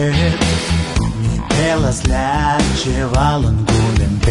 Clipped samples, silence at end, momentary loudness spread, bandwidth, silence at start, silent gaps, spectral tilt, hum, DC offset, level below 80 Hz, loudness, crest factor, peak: under 0.1%; 0 s; 3 LU; 11 kHz; 0 s; none; -5.5 dB/octave; none; under 0.1%; -22 dBFS; -16 LUFS; 12 dB; -2 dBFS